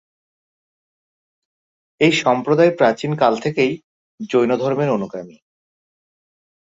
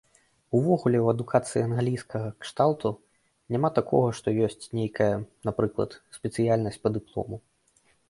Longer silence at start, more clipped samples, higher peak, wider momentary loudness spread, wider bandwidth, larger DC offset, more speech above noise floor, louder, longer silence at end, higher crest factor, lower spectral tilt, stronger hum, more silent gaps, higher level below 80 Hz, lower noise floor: first, 2 s vs 0.5 s; neither; first, -2 dBFS vs -6 dBFS; about the same, 13 LU vs 11 LU; second, 7.8 kHz vs 11.5 kHz; neither; first, over 73 dB vs 40 dB; first, -17 LUFS vs -27 LUFS; first, 1.4 s vs 0.7 s; about the same, 20 dB vs 20 dB; second, -6 dB/octave vs -7.5 dB/octave; neither; first, 3.84-4.18 s vs none; about the same, -62 dBFS vs -58 dBFS; first, under -90 dBFS vs -66 dBFS